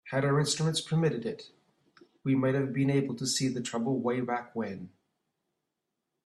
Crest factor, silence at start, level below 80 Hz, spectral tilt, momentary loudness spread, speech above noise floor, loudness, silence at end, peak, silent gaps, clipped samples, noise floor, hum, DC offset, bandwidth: 16 dB; 0.05 s; -70 dBFS; -5 dB/octave; 11 LU; 56 dB; -30 LUFS; 1.35 s; -16 dBFS; none; under 0.1%; -85 dBFS; none; under 0.1%; 13 kHz